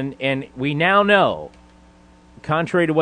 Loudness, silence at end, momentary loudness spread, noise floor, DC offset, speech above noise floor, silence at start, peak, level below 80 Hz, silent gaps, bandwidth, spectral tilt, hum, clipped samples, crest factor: -18 LUFS; 0 s; 17 LU; -49 dBFS; under 0.1%; 31 dB; 0 s; -4 dBFS; -52 dBFS; none; 9.8 kHz; -6.5 dB/octave; none; under 0.1%; 18 dB